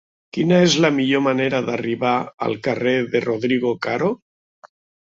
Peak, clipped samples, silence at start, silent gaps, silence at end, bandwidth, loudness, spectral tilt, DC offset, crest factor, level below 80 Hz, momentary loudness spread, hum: -2 dBFS; under 0.1%; 0.35 s; 2.34-2.38 s, 4.22-4.62 s; 0.45 s; 7.8 kHz; -19 LUFS; -5 dB/octave; under 0.1%; 18 dB; -60 dBFS; 8 LU; none